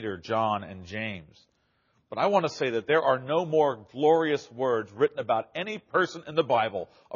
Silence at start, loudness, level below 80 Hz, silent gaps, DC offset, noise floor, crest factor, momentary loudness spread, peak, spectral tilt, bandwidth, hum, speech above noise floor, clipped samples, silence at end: 0 s; -27 LUFS; -70 dBFS; none; under 0.1%; -70 dBFS; 18 dB; 10 LU; -10 dBFS; -3.5 dB/octave; 7.2 kHz; none; 43 dB; under 0.1%; 0 s